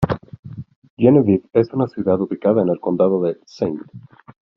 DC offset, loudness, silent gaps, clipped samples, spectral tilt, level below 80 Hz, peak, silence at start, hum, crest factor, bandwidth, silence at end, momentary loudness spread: under 0.1%; -18 LUFS; 0.39-0.43 s, 0.76-0.82 s, 0.90-0.97 s; under 0.1%; -9 dB/octave; -50 dBFS; -2 dBFS; 0 s; none; 18 dB; 6.4 kHz; 0.6 s; 19 LU